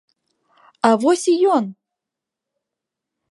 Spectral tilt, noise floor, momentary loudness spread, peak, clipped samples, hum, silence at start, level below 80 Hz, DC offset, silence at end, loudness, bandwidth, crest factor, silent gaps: -4.5 dB/octave; -85 dBFS; 5 LU; -2 dBFS; under 0.1%; none; 0.85 s; -78 dBFS; under 0.1%; 1.6 s; -17 LUFS; 11.5 kHz; 20 dB; none